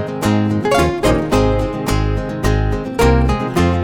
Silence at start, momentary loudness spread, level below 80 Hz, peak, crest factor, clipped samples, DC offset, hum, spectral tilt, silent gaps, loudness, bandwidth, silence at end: 0 s; 5 LU; -22 dBFS; -4 dBFS; 12 dB; under 0.1%; under 0.1%; none; -6.5 dB/octave; none; -16 LUFS; 18.5 kHz; 0 s